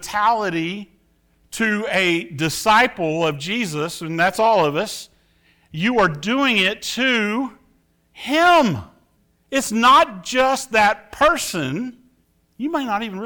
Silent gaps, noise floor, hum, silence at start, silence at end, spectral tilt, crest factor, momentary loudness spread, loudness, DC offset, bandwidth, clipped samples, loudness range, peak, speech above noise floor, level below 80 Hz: none; -62 dBFS; none; 0 s; 0 s; -4 dB/octave; 16 dB; 13 LU; -18 LUFS; under 0.1%; over 20 kHz; under 0.1%; 3 LU; -4 dBFS; 43 dB; -52 dBFS